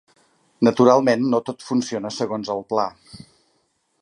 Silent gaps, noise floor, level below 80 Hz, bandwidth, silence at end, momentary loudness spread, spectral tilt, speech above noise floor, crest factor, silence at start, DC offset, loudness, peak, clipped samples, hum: none; -68 dBFS; -66 dBFS; 11 kHz; 0.85 s; 11 LU; -5.5 dB/octave; 48 dB; 20 dB; 0.6 s; under 0.1%; -20 LUFS; -2 dBFS; under 0.1%; none